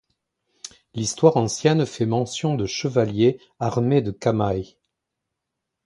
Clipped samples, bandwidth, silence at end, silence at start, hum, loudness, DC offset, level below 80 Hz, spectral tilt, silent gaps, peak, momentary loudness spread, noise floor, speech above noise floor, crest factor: under 0.1%; 11.5 kHz; 1.2 s; 0.65 s; none; -22 LUFS; under 0.1%; -52 dBFS; -6 dB/octave; none; -2 dBFS; 15 LU; -82 dBFS; 61 dB; 22 dB